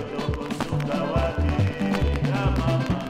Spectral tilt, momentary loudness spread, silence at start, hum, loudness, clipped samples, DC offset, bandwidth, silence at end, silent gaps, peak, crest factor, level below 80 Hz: -7 dB/octave; 5 LU; 0 s; none; -25 LUFS; under 0.1%; under 0.1%; 15 kHz; 0 s; none; -10 dBFS; 14 dB; -32 dBFS